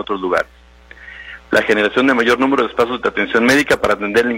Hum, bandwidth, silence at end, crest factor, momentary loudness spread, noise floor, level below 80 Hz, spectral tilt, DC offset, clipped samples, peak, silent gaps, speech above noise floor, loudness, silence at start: none; 16.5 kHz; 0 s; 16 dB; 17 LU; -41 dBFS; -46 dBFS; -4 dB/octave; under 0.1%; under 0.1%; 0 dBFS; none; 26 dB; -15 LUFS; 0 s